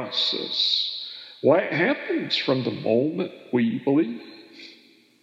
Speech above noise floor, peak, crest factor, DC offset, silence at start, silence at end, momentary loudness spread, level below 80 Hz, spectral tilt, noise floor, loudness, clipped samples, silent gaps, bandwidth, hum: 31 dB; -6 dBFS; 20 dB; under 0.1%; 0 s; 0.5 s; 16 LU; -88 dBFS; -5.5 dB/octave; -55 dBFS; -23 LUFS; under 0.1%; none; 8 kHz; none